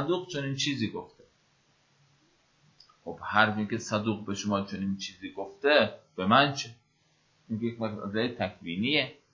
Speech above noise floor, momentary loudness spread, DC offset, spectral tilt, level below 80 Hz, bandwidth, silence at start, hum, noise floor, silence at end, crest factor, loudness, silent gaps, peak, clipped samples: 40 dB; 15 LU; under 0.1%; -4.5 dB/octave; -64 dBFS; 7.6 kHz; 0 s; none; -69 dBFS; 0.2 s; 26 dB; -29 LUFS; none; -6 dBFS; under 0.1%